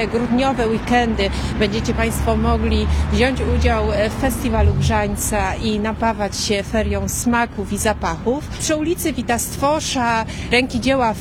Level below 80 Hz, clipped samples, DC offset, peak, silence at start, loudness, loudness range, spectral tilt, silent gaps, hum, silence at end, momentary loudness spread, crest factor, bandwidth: -26 dBFS; under 0.1%; under 0.1%; -4 dBFS; 0 s; -19 LUFS; 2 LU; -5 dB/octave; none; none; 0 s; 4 LU; 16 dB; 16.5 kHz